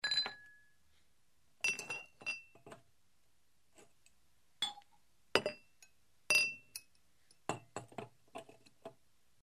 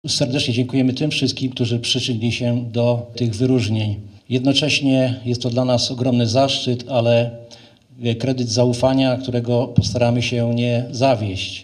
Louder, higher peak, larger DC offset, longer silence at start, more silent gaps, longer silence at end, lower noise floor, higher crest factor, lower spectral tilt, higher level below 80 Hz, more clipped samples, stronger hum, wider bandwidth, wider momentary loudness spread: second, -37 LUFS vs -19 LUFS; second, -10 dBFS vs 0 dBFS; neither; about the same, 0.05 s vs 0.05 s; neither; first, 0.5 s vs 0 s; first, -78 dBFS vs -45 dBFS; first, 34 dB vs 18 dB; second, -1 dB/octave vs -5.5 dB/octave; second, -80 dBFS vs -50 dBFS; neither; neither; first, 15 kHz vs 10.5 kHz; first, 26 LU vs 6 LU